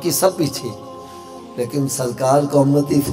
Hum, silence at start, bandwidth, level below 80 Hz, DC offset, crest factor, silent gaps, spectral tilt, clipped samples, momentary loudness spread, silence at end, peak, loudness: none; 0 s; 16.5 kHz; -52 dBFS; under 0.1%; 16 dB; none; -5.5 dB/octave; under 0.1%; 20 LU; 0 s; -2 dBFS; -18 LUFS